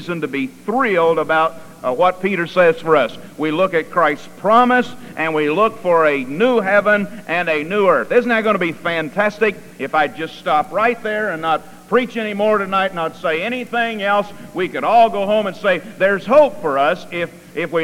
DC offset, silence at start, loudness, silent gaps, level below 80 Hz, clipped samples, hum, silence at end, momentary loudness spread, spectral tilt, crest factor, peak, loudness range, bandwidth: under 0.1%; 0 s; -17 LUFS; none; -56 dBFS; under 0.1%; none; 0 s; 9 LU; -5.5 dB/octave; 16 dB; -2 dBFS; 3 LU; 16 kHz